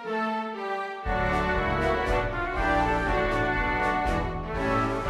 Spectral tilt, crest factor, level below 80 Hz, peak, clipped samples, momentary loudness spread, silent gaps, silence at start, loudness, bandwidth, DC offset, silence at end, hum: -6.5 dB/octave; 14 dB; -36 dBFS; -12 dBFS; under 0.1%; 6 LU; none; 0 s; -27 LUFS; 13 kHz; under 0.1%; 0 s; none